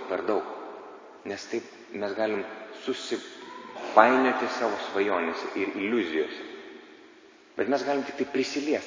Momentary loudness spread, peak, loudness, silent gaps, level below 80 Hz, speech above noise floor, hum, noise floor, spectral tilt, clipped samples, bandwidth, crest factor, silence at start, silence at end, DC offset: 18 LU; 0 dBFS; -28 LUFS; none; -74 dBFS; 26 dB; none; -54 dBFS; -4 dB/octave; under 0.1%; 7.6 kHz; 28 dB; 0 s; 0 s; under 0.1%